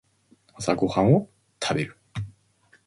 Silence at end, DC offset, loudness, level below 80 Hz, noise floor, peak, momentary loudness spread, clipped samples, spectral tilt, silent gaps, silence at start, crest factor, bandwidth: 0.55 s; under 0.1%; -24 LUFS; -54 dBFS; -61 dBFS; -6 dBFS; 17 LU; under 0.1%; -6 dB/octave; none; 0.6 s; 20 dB; 11.5 kHz